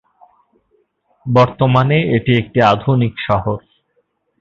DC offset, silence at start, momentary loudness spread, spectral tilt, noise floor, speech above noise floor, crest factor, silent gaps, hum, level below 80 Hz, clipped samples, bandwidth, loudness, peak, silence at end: under 0.1%; 1.25 s; 8 LU; -8 dB/octave; -64 dBFS; 51 dB; 16 dB; none; none; -44 dBFS; under 0.1%; 7 kHz; -15 LUFS; 0 dBFS; 0.8 s